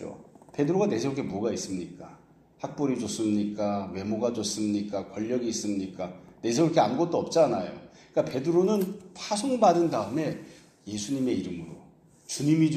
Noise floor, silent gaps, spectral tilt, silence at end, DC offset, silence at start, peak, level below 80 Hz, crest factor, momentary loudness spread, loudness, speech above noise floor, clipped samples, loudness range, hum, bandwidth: -55 dBFS; none; -5.5 dB/octave; 0 s; under 0.1%; 0 s; -8 dBFS; -66 dBFS; 20 dB; 15 LU; -28 LUFS; 28 dB; under 0.1%; 5 LU; none; 15 kHz